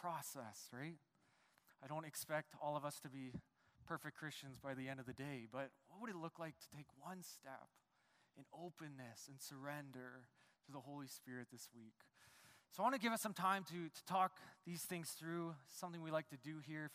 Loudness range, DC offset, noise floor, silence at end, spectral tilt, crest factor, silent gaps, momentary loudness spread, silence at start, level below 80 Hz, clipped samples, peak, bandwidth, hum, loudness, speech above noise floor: 12 LU; under 0.1%; -79 dBFS; 0 s; -4.5 dB/octave; 24 dB; none; 18 LU; 0 s; -86 dBFS; under 0.1%; -26 dBFS; 15.5 kHz; none; -48 LUFS; 31 dB